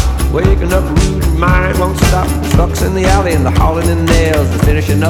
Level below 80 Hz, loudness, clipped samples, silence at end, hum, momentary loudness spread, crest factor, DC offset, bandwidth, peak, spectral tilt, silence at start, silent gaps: -14 dBFS; -12 LUFS; 0.1%; 0 s; none; 2 LU; 10 dB; under 0.1%; 17 kHz; 0 dBFS; -6 dB/octave; 0 s; none